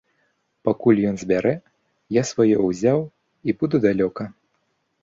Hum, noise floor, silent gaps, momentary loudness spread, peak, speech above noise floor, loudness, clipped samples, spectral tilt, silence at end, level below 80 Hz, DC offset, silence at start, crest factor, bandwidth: none; -70 dBFS; none; 12 LU; -4 dBFS; 51 dB; -21 LUFS; under 0.1%; -7 dB/octave; 0.7 s; -58 dBFS; under 0.1%; 0.65 s; 18 dB; 7.8 kHz